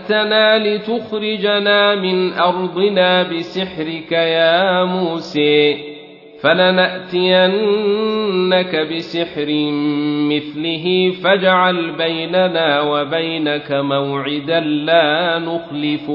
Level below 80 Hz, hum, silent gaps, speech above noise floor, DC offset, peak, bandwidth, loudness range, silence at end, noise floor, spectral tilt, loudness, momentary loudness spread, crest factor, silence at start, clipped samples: -60 dBFS; none; none; 22 dB; under 0.1%; 0 dBFS; 6 kHz; 2 LU; 0 s; -37 dBFS; -7 dB/octave; -16 LUFS; 8 LU; 16 dB; 0 s; under 0.1%